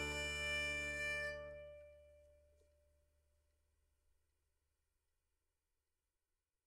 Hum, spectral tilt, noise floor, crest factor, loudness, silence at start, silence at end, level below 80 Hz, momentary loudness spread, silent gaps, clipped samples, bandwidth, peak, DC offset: none; -2.5 dB/octave; under -90 dBFS; 18 dB; -41 LUFS; 0 s; 4.35 s; -62 dBFS; 17 LU; none; under 0.1%; 15.5 kHz; -32 dBFS; under 0.1%